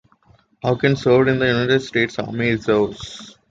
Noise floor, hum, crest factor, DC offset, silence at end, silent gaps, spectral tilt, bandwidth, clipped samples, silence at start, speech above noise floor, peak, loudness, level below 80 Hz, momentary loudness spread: -55 dBFS; none; 16 dB; under 0.1%; 0.2 s; none; -6.5 dB/octave; 7.8 kHz; under 0.1%; 0.65 s; 37 dB; -2 dBFS; -19 LUFS; -50 dBFS; 12 LU